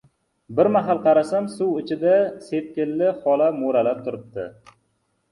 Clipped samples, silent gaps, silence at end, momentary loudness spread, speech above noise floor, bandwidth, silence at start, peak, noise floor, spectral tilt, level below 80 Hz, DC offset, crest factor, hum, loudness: under 0.1%; none; 0.8 s; 13 LU; 49 dB; 11.5 kHz; 0.5 s; -4 dBFS; -70 dBFS; -7.5 dB/octave; -66 dBFS; under 0.1%; 16 dB; none; -21 LUFS